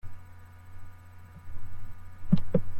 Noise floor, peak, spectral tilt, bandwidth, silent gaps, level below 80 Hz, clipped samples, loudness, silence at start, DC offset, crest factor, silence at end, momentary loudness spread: -47 dBFS; -10 dBFS; -9.5 dB/octave; 4.4 kHz; none; -42 dBFS; under 0.1%; -29 LUFS; 0.05 s; under 0.1%; 18 dB; 0 s; 24 LU